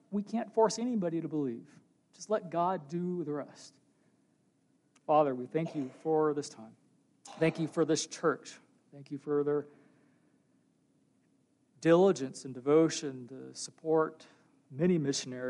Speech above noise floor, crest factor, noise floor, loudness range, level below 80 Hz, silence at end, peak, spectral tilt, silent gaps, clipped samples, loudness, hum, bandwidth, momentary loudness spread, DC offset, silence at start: 40 dB; 20 dB; -72 dBFS; 7 LU; -82 dBFS; 0 s; -14 dBFS; -5.5 dB/octave; none; under 0.1%; -32 LUFS; none; 11.5 kHz; 19 LU; under 0.1%; 0.1 s